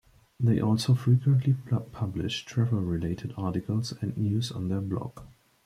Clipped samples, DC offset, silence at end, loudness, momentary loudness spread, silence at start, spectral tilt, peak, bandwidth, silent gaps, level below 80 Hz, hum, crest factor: under 0.1%; under 0.1%; 0.4 s; -28 LUFS; 10 LU; 0.4 s; -7 dB/octave; -12 dBFS; 12.5 kHz; none; -54 dBFS; none; 16 dB